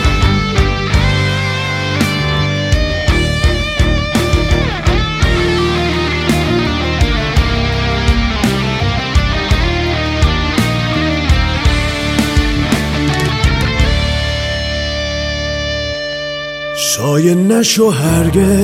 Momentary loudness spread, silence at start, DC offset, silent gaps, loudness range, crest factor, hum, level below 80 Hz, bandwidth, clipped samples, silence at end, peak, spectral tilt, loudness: 6 LU; 0 s; under 0.1%; none; 2 LU; 12 dB; none; -18 dBFS; 16.5 kHz; under 0.1%; 0 s; 0 dBFS; -5 dB/octave; -14 LUFS